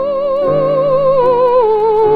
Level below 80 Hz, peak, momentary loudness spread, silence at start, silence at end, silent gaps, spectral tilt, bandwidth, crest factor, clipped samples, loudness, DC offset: -42 dBFS; -2 dBFS; 3 LU; 0 s; 0 s; none; -8.5 dB/octave; 5 kHz; 10 dB; under 0.1%; -12 LUFS; under 0.1%